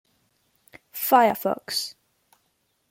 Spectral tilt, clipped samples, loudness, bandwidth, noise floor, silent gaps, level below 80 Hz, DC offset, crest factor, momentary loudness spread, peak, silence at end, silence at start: -3 dB/octave; under 0.1%; -23 LUFS; 16.5 kHz; -71 dBFS; none; -72 dBFS; under 0.1%; 22 dB; 16 LU; -4 dBFS; 1 s; 0.95 s